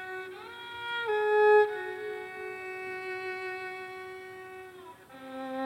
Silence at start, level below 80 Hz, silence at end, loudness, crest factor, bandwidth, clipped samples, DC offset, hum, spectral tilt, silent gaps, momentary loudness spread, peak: 0 s; -76 dBFS; 0 s; -30 LUFS; 16 dB; 15.5 kHz; under 0.1%; under 0.1%; none; -4 dB/octave; none; 22 LU; -14 dBFS